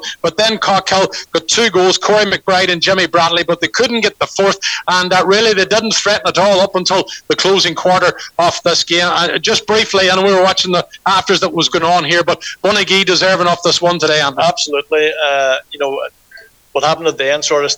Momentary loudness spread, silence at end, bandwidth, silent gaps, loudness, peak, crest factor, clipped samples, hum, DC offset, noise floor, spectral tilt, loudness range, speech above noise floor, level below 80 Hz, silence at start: 6 LU; 0 s; over 20 kHz; none; -12 LUFS; -2 dBFS; 12 dB; under 0.1%; none; under 0.1%; -41 dBFS; -2.5 dB/octave; 2 LU; 28 dB; -52 dBFS; 0 s